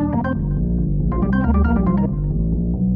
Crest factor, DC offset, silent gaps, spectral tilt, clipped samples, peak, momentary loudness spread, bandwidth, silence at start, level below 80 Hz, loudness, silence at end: 14 dB; under 0.1%; none; -12.5 dB/octave; under 0.1%; -4 dBFS; 4 LU; 3.3 kHz; 0 s; -22 dBFS; -20 LUFS; 0 s